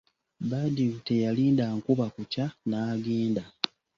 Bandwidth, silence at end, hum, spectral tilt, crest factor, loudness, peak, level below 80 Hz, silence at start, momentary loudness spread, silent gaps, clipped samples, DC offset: 7.4 kHz; 0.3 s; none; -7.5 dB/octave; 26 dB; -29 LUFS; -2 dBFS; -64 dBFS; 0.4 s; 8 LU; none; under 0.1%; under 0.1%